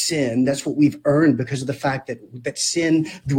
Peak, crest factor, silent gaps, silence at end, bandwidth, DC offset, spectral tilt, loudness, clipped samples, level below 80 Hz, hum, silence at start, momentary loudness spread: -6 dBFS; 14 dB; none; 0 s; 16.5 kHz; under 0.1%; -5 dB/octave; -20 LUFS; under 0.1%; -56 dBFS; none; 0 s; 11 LU